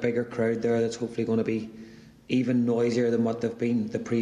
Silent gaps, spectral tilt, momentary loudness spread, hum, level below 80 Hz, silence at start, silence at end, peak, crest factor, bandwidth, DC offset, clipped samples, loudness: none; -7 dB/octave; 6 LU; none; -64 dBFS; 0 s; 0 s; -12 dBFS; 14 dB; 10 kHz; under 0.1%; under 0.1%; -27 LUFS